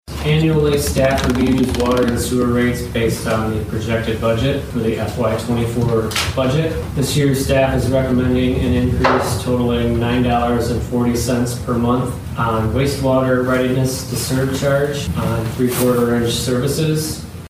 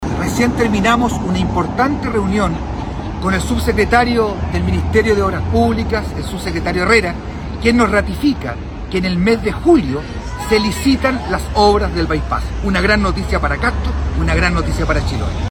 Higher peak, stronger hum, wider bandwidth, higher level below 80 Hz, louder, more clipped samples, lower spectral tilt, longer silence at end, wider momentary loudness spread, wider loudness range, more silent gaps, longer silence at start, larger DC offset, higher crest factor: about the same, 0 dBFS vs 0 dBFS; neither; about the same, 16 kHz vs 17.5 kHz; second, -30 dBFS vs -24 dBFS; about the same, -17 LUFS vs -16 LUFS; neither; about the same, -6 dB/octave vs -6 dB/octave; about the same, 0 s vs 0 s; second, 4 LU vs 9 LU; about the same, 2 LU vs 1 LU; neither; about the same, 0.05 s vs 0 s; neither; about the same, 16 dB vs 16 dB